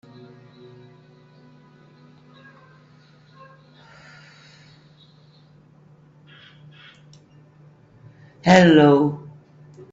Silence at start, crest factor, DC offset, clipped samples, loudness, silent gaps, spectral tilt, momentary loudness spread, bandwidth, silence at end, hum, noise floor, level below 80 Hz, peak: 8.45 s; 24 dB; under 0.1%; under 0.1%; -15 LUFS; none; -6.5 dB/octave; 13 LU; 7.8 kHz; 0.75 s; none; -52 dBFS; -62 dBFS; 0 dBFS